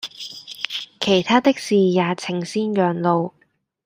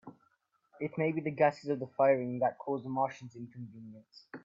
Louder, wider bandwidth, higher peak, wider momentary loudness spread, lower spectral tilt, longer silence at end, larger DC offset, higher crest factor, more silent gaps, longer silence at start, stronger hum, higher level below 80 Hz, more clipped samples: first, -20 LUFS vs -32 LUFS; first, 15.5 kHz vs 7.6 kHz; first, -2 dBFS vs -14 dBFS; second, 14 LU vs 20 LU; second, -5.5 dB/octave vs -8 dB/octave; first, 0.55 s vs 0.05 s; neither; about the same, 18 dB vs 20 dB; neither; about the same, 0 s vs 0.05 s; neither; first, -64 dBFS vs -80 dBFS; neither